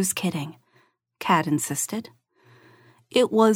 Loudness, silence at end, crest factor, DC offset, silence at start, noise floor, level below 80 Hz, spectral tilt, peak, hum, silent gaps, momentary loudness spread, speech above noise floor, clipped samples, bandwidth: -24 LUFS; 0 s; 20 dB; under 0.1%; 0 s; -64 dBFS; -72 dBFS; -4 dB/octave; -6 dBFS; none; none; 12 LU; 41 dB; under 0.1%; 17 kHz